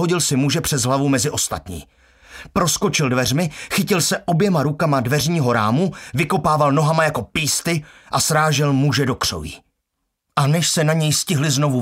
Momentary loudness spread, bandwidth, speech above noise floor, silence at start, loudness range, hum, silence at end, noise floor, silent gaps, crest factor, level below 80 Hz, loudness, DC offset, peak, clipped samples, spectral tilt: 7 LU; 16 kHz; 57 dB; 0 s; 2 LU; none; 0 s; -76 dBFS; none; 18 dB; -46 dBFS; -18 LUFS; under 0.1%; -2 dBFS; under 0.1%; -4.5 dB/octave